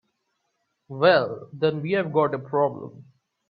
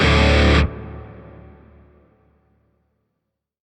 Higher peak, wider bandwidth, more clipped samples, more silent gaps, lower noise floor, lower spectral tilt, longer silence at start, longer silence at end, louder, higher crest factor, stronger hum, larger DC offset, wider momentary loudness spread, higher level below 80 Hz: second, -6 dBFS vs -2 dBFS; second, 5.2 kHz vs 9.2 kHz; neither; neither; about the same, -75 dBFS vs -78 dBFS; first, -9 dB/octave vs -6 dB/octave; first, 0.9 s vs 0 s; second, 0.5 s vs 2.5 s; second, -23 LUFS vs -16 LUFS; about the same, 20 dB vs 18 dB; neither; neither; second, 19 LU vs 26 LU; second, -68 dBFS vs -26 dBFS